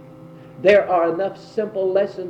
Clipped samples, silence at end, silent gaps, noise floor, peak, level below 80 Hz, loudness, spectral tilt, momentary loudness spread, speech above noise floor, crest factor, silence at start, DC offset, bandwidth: under 0.1%; 0 s; none; -41 dBFS; -2 dBFS; -62 dBFS; -19 LUFS; -6.5 dB/octave; 10 LU; 22 dB; 18 dB; 0 s; under 0.1%; 8 kHz